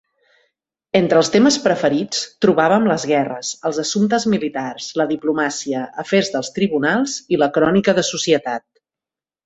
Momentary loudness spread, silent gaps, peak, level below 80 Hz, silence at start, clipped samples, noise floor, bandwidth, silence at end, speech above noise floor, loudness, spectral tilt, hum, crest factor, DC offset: 9 LU; none; -2 dBFS; -58 dBFS; 0.95 s; under 0.1%; -89 dBFS; 8.2 kHz; 0.85 s; 72 dB; -18 LUFS; -4.5 dB/octave; none; 16 dB; under 0.1%